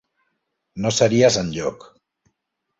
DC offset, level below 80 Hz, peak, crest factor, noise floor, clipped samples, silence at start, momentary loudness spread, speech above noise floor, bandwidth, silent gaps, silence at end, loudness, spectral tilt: under 0.1%; -52 dBFS; -2 dBFS; 20 dB; -77 dBFS; under 0.1%; 0.75 s; 13 LU; 58 dB; 8 kHz; none; 1.05 s; -19 LUFS; -4.5 dB/octave